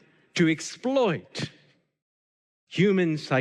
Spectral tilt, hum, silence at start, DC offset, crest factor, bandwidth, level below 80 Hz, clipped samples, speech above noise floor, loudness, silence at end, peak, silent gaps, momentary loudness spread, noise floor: -5.5 dB/octave; none; 0.35 s; under 0.1%; 16 dB; 11 kHz; -72 dBFS; under 0.1%; over 66 dB; -26 LUFS; 0 s; -10 dBFS; 2.02-2.67 s; 13 LU; under -90 dBFS